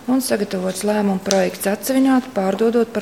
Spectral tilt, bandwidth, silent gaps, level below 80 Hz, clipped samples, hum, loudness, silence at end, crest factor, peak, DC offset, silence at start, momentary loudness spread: -5 dB/octave; 17 kHz; none; -60 dBFS; under 0.1%; none; -19 LUFS; 0 s; 18 dB; 0 dBFS; 0.2%; 0 s; 5 LU